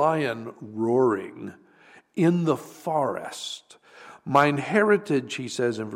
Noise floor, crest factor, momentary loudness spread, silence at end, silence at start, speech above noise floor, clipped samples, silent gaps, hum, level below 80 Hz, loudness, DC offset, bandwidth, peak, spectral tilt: -54 dBFS; 20 dB; 17 LU; 0 s; 0 s; 30 dB; under 0.1%; none; none; -74 dBFS; -25 LUFS; under 0.1%; 16 kHz; -6 dBFS; -6 dB/octave